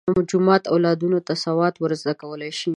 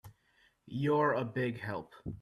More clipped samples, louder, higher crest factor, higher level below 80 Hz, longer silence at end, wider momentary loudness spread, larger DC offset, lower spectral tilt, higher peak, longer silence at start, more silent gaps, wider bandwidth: neither; first, -21 LUFS vs -34 LUFS; about the same, 20 dB vs 18 dB; first, -56 dBFS vs -64 dBFS; about the same, 0 s vs 0.05 s; second, 10 LU vs 14 LU; neither; second, -6 dB/octave vs -8 dB/octave; first, -2 dBFS vs -16 dBFS; about the same, 0.05 s vs 0.05 s; neither; second, 10.5 kHz vs 13.5 kHz